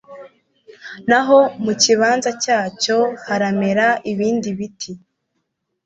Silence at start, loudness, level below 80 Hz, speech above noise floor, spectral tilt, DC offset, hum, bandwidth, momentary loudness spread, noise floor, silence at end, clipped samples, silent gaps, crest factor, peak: 0.1 s; -17 LUFS; -62 dBFS; 56 dB; -3.5 dB/octave; under 0.1%; none; 8.2 kHz; 14 LU; -73 dBFS; 0.9 s; under 0.1%; none; 16 dB; -2 dBFS